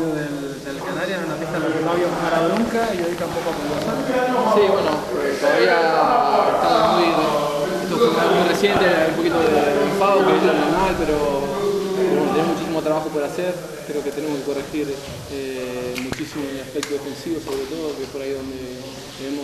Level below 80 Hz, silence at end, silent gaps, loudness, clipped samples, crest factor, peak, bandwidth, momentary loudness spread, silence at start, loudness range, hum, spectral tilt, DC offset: -46 dBFS; 0 s; none; -20 LUFS; under 0.1%; 18 dB; -2 dBFS; 13.5 kHz; 12 LU; 0 s; 10 LU; none; -5 dB/octave; under 0.1%